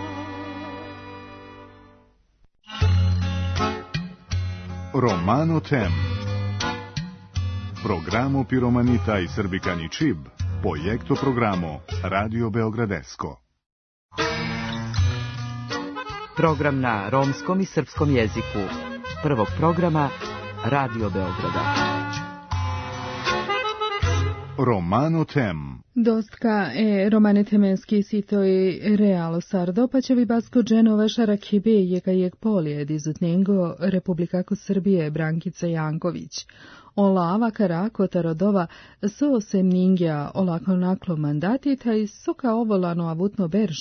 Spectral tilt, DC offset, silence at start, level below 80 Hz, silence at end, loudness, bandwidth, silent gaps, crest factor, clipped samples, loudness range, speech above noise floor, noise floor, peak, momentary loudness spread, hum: -7 dB/octave; under 0.1%; 0 s; -48 dBFS; 0 s; -23 LUFS; 6.6 kHz; 13.66-14.09 s; 18 dB; under 0.1%; 6 LU; 38 dB; -60 dBFS; -4 dBFS; 11 LU; none